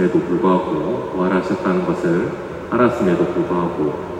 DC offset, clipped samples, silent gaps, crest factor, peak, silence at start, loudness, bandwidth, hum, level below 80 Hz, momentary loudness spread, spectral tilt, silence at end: under 0.1%; under 0.1%; none; 16 dB; -4 dBFS; 0 s; -19 LUFS; 9.8 kHz; none; -48 dBFS; 6 LU; -8 dB/octave; 0 s